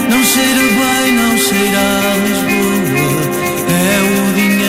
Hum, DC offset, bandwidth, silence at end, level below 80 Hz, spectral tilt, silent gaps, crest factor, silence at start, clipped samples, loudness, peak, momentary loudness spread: none; under 0.1%; 16.5 kHz; 0 s; -40 dBFS; -3.5 dB/octave; none; 10 dB; 0 s; under 0.1%; -12 LUFS; -2 dBFS; 4 LU